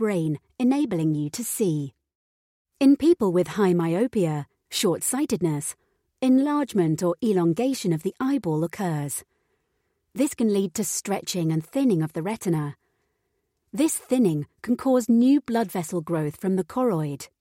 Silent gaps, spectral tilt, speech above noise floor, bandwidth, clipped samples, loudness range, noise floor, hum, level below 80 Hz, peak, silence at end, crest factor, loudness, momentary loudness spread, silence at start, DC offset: 2.15-2.65 s; -6 dB/octave; 52 dB; 16.5 kHz; under 0.1%; 4 LU; -75 dBFS; none; -64 dBFS; -8 dBFS; 0.15 s; 16 dB; -24 LUFS; 9 LU; 0 s; under 0.1%